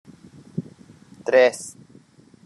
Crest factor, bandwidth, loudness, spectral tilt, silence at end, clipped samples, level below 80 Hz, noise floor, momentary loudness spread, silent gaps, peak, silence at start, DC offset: 20 dB; 12 kHz; -19 LUFS; -4 dB/octave; 0.75 s; under 0.1%; -72 dBFS; -52 dBFS; 18 LU; none; -4 dBFS; 0.55 s; under 0.1%